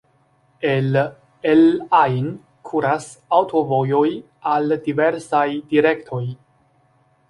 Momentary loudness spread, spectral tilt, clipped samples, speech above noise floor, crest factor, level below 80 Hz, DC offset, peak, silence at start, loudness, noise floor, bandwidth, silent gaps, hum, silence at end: 12 LU; -7 dB/octave; under 0.1%; 42 dB; 18 dB; -62 dBFS; under 0.1%; -2 dBFS; 0.6 s; -19 LUFS; -60 dBFS; 11.5 kHz; none; none; 0.95 s